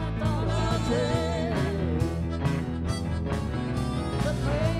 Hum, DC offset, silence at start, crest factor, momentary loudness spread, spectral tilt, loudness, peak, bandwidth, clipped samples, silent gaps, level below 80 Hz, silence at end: none; under 0.1%; 0 s; 14 dB; 4 LU; -6.5 dB/octave; -28 LUFS; -12 dBFS; 13.5 kHz; under 0.1%; none; -36 dBFS; 0 s